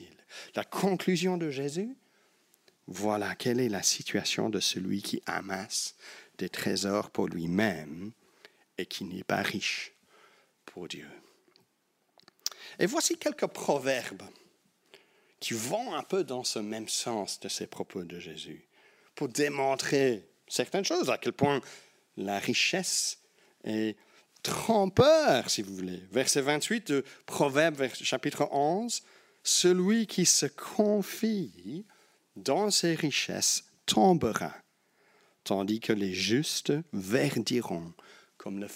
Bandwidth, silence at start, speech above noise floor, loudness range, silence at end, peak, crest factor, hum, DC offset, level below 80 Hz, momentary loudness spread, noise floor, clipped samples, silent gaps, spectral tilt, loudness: 16 kHz; 0 s; 45 dB; 8 LU; 0 s; -10 dBFS; 22 dB; none; under 0.1%; -70 dBFS; 16 LU; -74 dBFS; under 0.1%; none; -3.5 dB/octave; -29 LUFS